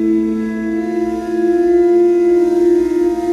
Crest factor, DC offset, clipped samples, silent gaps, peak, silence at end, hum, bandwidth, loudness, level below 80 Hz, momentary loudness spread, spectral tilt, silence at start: 10 dB; under 0.1%; under 0.1%; none; -4 dBFS; 0 s; none; 7.4 kHz; -14 LUFS; -44 dBFS; 7 LU; -7 dB/octave; 0 s